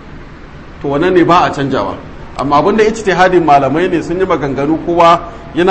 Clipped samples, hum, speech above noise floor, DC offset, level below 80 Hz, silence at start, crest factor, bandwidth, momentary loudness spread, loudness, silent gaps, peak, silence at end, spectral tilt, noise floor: 0.2%; none; 21 dB; 0.7%; -34 dBFS; 0 s; 12 dB; 8.6 kHz; 12 LU; -11 LUFS; none; 0 dBFS; 0 s; -6 dB/octave; -31 dBFS